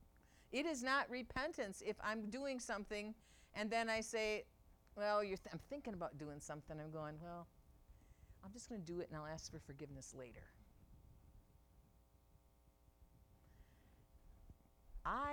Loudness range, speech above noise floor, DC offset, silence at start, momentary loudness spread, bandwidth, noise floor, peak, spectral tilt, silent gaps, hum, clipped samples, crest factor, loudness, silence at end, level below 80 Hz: 13 LU; 26 dB; under 0.1%; 0 s; 17 LU; 19 kHz; -72 dBFS; -26 dBFS; -4 dB/octave; none; none; under 0.1%; 20 dB; -45 LUFS; 0 s; -66 dBFS